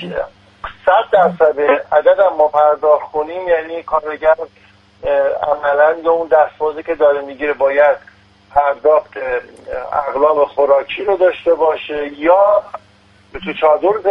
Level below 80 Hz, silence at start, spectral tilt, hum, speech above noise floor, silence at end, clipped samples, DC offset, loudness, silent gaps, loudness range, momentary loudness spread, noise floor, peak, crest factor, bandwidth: -48 dBFS; 0 s; -6.5 dB/octave; none; 34 dB; 0 s; under 0.1%; under 0.1%; -14 LUFS; none; 3 LU; 12 LU; -48 dBFS; 0 dBFS; 14 dB; 5.4 kHz